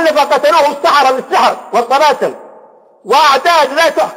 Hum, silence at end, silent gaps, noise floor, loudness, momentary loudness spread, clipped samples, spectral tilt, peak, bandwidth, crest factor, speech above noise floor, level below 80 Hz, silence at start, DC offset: none; 0 s; none; -41 dBFS; -10 LUFS; 5 LU; under 0.1%; -2 dB/octave; 0 dBFS; 16.5 kHz; 10 dB; 31 dB; -58 dBFS; 0 s; under 0.1%